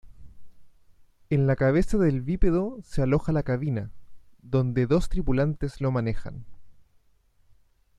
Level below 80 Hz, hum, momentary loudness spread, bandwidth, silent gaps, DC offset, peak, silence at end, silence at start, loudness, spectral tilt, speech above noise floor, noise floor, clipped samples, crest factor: -36 dBFS; none; 9 LU; 11 kHz; none; under 0.1%; -10 dBFS; 1.25 s; 0.05 s; -26 LUFS; -8.5 dB/octave; 38 dB; -62 dBFS; under 0.1%; 16 dB